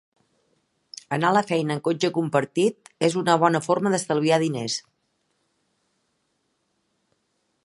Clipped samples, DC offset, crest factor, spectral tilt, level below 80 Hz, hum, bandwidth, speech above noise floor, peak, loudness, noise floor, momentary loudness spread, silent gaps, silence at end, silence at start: under 0.1%; under 0.1%; 22 dB; -5 dB/octave; -72 dBFS; none; 11.5 kHz; 51 dB; -4 dBFS; -23 LUFS; -73 dBFS; 9 LU; none; 2.85 s; 1.1 s